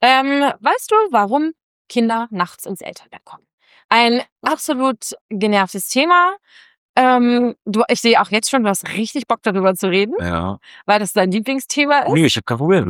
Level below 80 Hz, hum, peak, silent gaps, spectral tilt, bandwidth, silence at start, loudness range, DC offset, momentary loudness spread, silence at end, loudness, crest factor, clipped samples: -52 dBFS; none; -2 dBFS; 1.63-1.85 s, 3.53-3.58 s, 3.85-3.89 s, 4.32-4.36 s, 5.21-5.29 s, 6.78-6.94 s; -4 dB/octave; 18 kHz; 0 s; 4 LU; under 0.1%; 10 LU; 0 s; -16 LUFS; 16 dB; under 0.1%